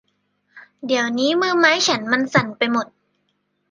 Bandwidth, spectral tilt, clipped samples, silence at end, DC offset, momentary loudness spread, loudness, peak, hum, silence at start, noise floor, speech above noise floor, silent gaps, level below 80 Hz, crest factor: 10 kHz; -3.5 dB/octave; under 0.1%; 0.85 s; under 0.1%; 9 LU; -18 LUFS; -2 dBFS; 50 Hz at -45 dBFS; 0.55 s; -70 dBFS; 51 dB; none; -68 dBFS; 20 dB